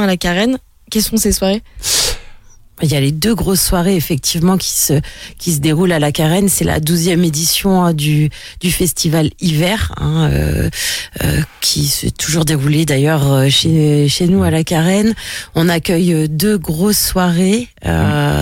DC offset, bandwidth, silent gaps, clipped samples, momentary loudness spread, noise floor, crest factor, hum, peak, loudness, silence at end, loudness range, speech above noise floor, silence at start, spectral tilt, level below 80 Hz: under 0.1%; 17 kHz; none; under 0.1%; 5 LU; -38 dBFS; 12 dB; none; -2 dBFS; -14 LUFS; 0 s; 3 LU; 24 dB; 0 s; -4.5 dB/octave; -30 dBFS